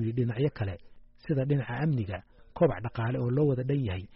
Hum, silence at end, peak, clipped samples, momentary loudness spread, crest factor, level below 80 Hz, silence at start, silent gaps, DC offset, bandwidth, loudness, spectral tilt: none; 0.1 s; -14 dBFS; under 0.1%; 12 LU; 16 dB; -54 dBFS; 0 s; none; under 0.1%; 5.6 kHz; -30 LUFS; -8 dB/octave